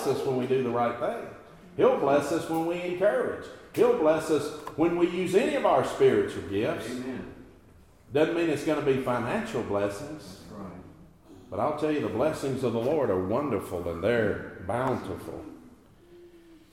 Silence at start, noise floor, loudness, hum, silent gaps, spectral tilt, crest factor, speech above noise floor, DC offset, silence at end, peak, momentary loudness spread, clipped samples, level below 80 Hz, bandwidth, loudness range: 0 s; -55 dBFS; -27 LUFS; none; none; -6 dB/octave; 18 dB; 28 dB; under 0.1%; 0.15 s; -10 dBFS; 16 LU; under 0.1%; -60 dBFS; 16 kHz; 6 LU